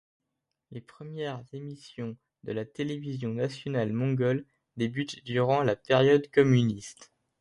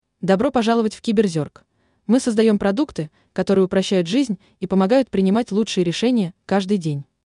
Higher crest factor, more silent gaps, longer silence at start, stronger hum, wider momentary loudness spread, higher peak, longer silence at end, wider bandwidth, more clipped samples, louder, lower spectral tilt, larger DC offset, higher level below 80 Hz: about the same, 20 dB vs 16 dB; neither; first, 0.7 s vs 0.2 s; neither; first, 21 LU vs 10 LU; second, -8 dBFS vs -4 dBFS; about the same, 0.35 s vs 0.3 s; about the same, 11.5 kHz vs 11 kHz; neither; second, -28 LUFS vs -20 LUFS; about the same, -7 dB/octave vs -6 dB/octave; neither; second, -64 dBFS vs -54 dBFS